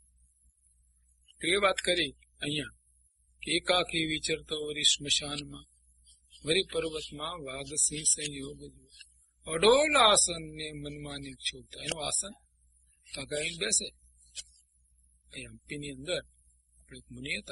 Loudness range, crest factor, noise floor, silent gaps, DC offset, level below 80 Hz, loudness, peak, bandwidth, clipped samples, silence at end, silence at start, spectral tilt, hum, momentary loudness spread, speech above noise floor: 9 LU; 22 dB; -68 dBFS; none; under 0.1%; -58 dBFS; -29 LUFS; -10 dBFS; 11.5 kHz; under 0.1%; 0 s; 1.4 s; -1.5 dB/octave; none; 20 LU; 37 dB